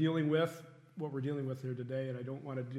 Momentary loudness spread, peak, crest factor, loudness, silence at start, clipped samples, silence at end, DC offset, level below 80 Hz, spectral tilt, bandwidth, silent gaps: 12 LU; -18 dBFS; 18 dB; -37 LUFS; 0 s; under 0.1%; 0 s; under 0.1%; -84 dBFS; -8 dB/octave; 14.5 kHz; none